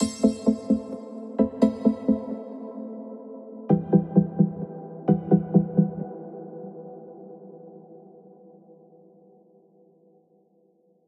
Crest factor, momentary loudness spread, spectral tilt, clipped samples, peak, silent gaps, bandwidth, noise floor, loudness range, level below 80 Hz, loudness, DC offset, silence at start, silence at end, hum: 22 dB; 22 LU; -8.5 dB/octave; under 0.1%; -6 dBFS; none; 10.5 kHz; -63 dBFS; 18 LU; -58 dBFS; -25 LUFS; under 0.1%; 0 s; 3 s; none